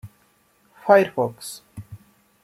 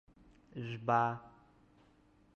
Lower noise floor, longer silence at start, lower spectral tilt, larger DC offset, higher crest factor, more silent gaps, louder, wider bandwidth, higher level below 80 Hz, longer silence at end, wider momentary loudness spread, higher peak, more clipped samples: second, -61 dBFS vs -67 dBFS; second, 0.05 s vs 0.55 s; second, -5 dB/octave vs -7.5 dB/octave; neither; about the same, 22 dB vs 22 dB; neither; first, -20 LUFS vs -36 LUFS; first, 15 kHz vs 7 kHz; first, -62 dBFS vs -72 dBFS; second, 0.45 s vs 1.05 s; first, 24 LU vs 16 LU; first, -2 dBFS vs -16 dBFS; neither